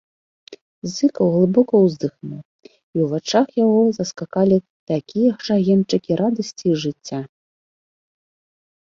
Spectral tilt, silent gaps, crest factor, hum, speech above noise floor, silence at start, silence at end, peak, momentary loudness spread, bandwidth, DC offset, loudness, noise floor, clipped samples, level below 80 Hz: -6.5 dB/octave; 0.61-0.82 s, 2.45-2.59 s, 2.83-2.93 s, 4.70-4.87 s; 16 dB; none; over 72 dB; 0.5 s; 1.55 s; -2 dBFS; 14 LU; 7.6 kHz; under 0.1%; -19 LUFS; under -90 dBFS; under 0.1%; -62 dBFS